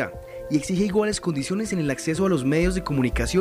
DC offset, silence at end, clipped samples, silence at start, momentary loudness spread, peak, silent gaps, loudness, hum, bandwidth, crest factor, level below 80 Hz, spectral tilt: under 0.1%; 0 s; under 0.1%; 0 s; 5 LU; -10 dBFS; none; -24 LUFS; none; 15.5 kHz; 14 dB; -36 dBFS; -5.5 dB/octave